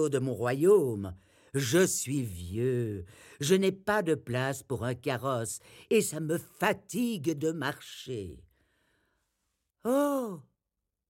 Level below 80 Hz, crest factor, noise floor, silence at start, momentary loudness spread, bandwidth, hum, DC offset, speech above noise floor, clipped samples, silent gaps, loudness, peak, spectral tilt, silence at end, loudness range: -66 dBFS; 20 dB; -86 dBFS; 0 s; 14 LU; 16.5 kHz; none; under 0.1%; 57 dB; under 0.1%; none; -30 LUFS; -12 dBFS; -5 dB/octave; 0.7 s; 6 LU